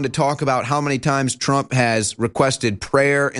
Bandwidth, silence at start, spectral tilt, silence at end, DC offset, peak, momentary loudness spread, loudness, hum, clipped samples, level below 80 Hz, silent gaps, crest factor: 11.5 kHz; 0 s; -4.5 dB/octave; 0 s; under 0.1%; -2 dBFS; 3 LU; -19 LUFS; none; under 0.1%; -50 dBFS; none; 18 dB